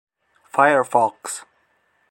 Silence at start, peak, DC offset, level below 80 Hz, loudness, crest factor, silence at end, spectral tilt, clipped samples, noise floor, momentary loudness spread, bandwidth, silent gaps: 0.55 s; -2 dBFS; under 0.1%; -74 dBFS; -19 LUFS; 20 dB; 0.7 s; -3.5 dB/octave; under 0.1%; -64 dBFS; 15 LU; 16.5 kHz; none